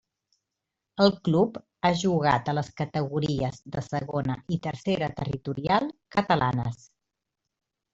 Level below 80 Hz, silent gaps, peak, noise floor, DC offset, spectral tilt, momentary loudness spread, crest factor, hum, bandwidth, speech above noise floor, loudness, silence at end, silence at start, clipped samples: -56 dBFS; none; -6 dBFS; -85 dBFS; under 0.1%; -6.5 dB/octave; 8 LU; 22 dB; none; 8 kHz; 59 dB; -27 LUFS; 1.2 s; 0.95 s; under 0.1%